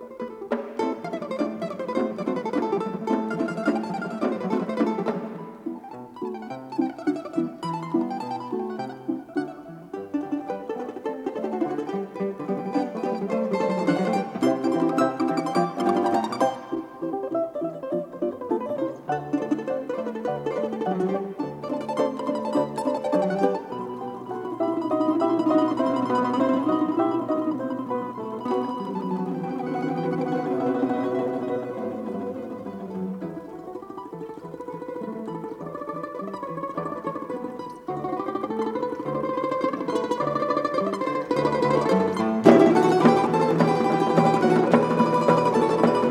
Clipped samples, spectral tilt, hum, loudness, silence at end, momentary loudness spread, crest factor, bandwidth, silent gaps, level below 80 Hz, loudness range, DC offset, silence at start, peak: under 0.1%; -7 dB/octave; none; -25 LUFS; 0 s; 13 LU; 24 dB; 13 kHz; none; -66 dBFS; 12 LU; under 0.1%; 0 s; 0 dBFS